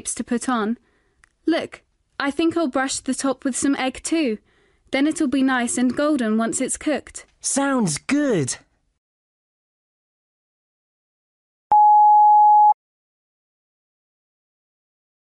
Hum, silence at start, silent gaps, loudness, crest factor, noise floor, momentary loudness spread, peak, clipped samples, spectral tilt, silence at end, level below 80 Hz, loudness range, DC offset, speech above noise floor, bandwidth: none; 0.05 s; 8.98-11.70 s; -19 LUFS; 12 dB; -60 dBFS; 15 LU; -8 dBFS; under 0.1%; -3.5 dB/octave; 2.65 s; -58 dBFS; 8 LU; under 0.1%; 39 dB; 11.5 kHz